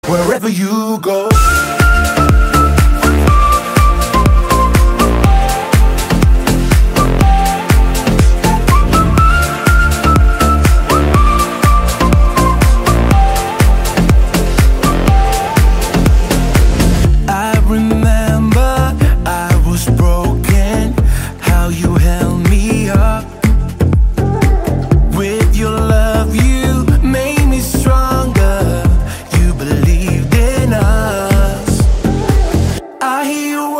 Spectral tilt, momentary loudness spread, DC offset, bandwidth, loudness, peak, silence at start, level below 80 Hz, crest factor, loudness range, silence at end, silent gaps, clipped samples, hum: -6 dB/octave; 4 LU; under 0.1%; 16.5 kHz; -12 LUFS; 0 dBFS; 0.05 s; -12 dBFS; 10 dB; 3 LU; 0 s; none; under 0.1%; none